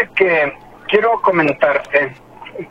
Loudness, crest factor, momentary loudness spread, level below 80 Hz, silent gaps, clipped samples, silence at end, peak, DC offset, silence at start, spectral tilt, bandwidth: -15 LUFS; 16 dB; 16 LU; -52 dBFS; none; under 0.1%; 0.05 s; 0 dBFS; under 0.1%; 0 s; -6.5 dB/octave; 8 kHz